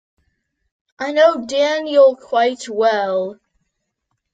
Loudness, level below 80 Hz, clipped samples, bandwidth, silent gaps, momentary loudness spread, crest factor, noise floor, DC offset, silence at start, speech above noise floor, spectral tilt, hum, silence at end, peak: -16 LUFS; -66 dBFS; under 0.1%; 9.2 kHz; none; 9 LU; 16 dB; -74 dBFS; under 0.1%; 1 s; 58 dB; -3.5 dB/octave; none; 1 s; -2 dBFS